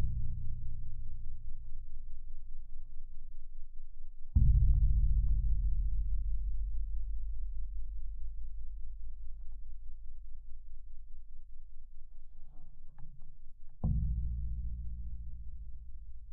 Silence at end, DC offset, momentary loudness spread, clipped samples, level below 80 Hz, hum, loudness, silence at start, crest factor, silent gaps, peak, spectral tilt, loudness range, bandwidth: 0 s; under 0.1%; 24 LU; under 0.1%; -36 dBFS; none; -38 LUFS; 0 s; 16 dB; none; -16 dBFS; -16 dB/octave; 20 LU; 0.8 kHz